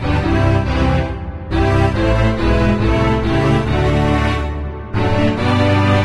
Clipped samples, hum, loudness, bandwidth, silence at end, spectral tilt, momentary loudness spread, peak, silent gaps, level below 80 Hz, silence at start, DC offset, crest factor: under 0.1%; none; -16 LUFS; 11 kHz; 0 s; -7.5 dB/octave; 7 LU; -2 dBFS; none; -22 dBFS; 0 s; under 0.1%; 12 dB